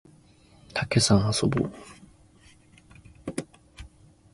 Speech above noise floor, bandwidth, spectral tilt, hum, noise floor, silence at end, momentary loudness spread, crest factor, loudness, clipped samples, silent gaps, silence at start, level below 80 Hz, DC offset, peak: 32 dB; 11.5 kHz; -4.5 dB/octave; none; -56 dBFS; 0.45 s; 27 LU; 22 dB; -26 LUFS; under 0.1%; none; 0.75 s; -50 dBFS; under 0.1%; -8 dBFS